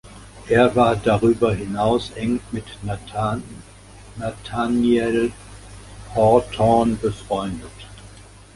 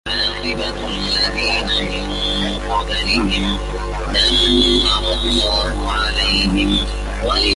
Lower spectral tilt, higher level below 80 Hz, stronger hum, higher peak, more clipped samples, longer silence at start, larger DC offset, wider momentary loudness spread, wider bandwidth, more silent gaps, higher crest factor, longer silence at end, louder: first, -6.5 dB/octave vs -4 dB/octave; second, -42 dBFS vs -24 dBFS; second, 50 Hz at -40 dBFS vs 50 Hz at -25 dBFS; about the same, -2 dBFS vs -2 dBFS; neither; about the same, 0.05 s vs 0.05 s; neither; first, 24 LU vs 10 LU; about the same, 11.5 kHz vs 11.5 kHz; neither; about the same, 18 dB vs 16 dB; first, 0.35 s vs 0 s; second, -20 LUFS vs -17 LUFS